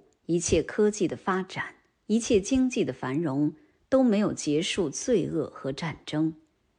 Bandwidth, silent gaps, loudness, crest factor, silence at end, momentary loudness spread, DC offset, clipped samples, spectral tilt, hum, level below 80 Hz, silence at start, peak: 10 kHz; none; -27 LUFS; 16 dB; 0.45 s; 9 LU; under 0.1%; under 0.1%; -5 dB/octave; none; -52 dBFS; 0.3 s; -10 dBFS